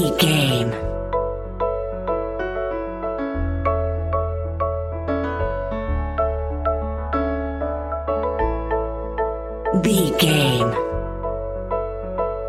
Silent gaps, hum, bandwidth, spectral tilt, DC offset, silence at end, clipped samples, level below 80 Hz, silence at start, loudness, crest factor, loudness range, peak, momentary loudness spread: none; none; 16 kHz; -5.5 dB/octave; under 0.1%; 0 s; under 0.1%; -30 dBFS; 0 s; -23 LUFS; 20 dB; 4 LU; -2 dBFS; 9 LU